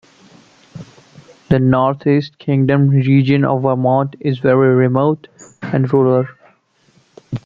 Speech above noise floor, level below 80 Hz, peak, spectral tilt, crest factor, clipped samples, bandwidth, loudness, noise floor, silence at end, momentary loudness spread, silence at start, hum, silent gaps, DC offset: 42 dB; -50 dBFS; 0 dBFS; -9 dB/octave; 16 dB; under 0.1%; 7.4 kHz; -15 LUFS; -55 dBFS; 0.05 s; 8 LU; 0.75 s; none; none; under 0.1%